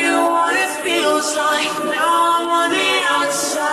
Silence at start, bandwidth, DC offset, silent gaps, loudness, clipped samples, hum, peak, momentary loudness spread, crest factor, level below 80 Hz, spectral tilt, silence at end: 0 s; 13.5 kHz; under 0.1%; none; -16 LUFS; under 0.1%; none; -4 dBFS; 3 LU; 12 dB; -66 dBFS; -1 dB/octave; 0 s